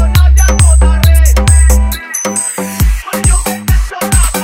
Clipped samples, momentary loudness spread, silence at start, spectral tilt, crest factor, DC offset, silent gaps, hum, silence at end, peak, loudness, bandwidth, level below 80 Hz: 0.6%; 7 LU; 0 s; -4.5 dB/octave; 8 dB; under 0.1%; none; none; 0 s; 0 dBFS; -10 LUFS; 16.5 kHz; -10 dBFS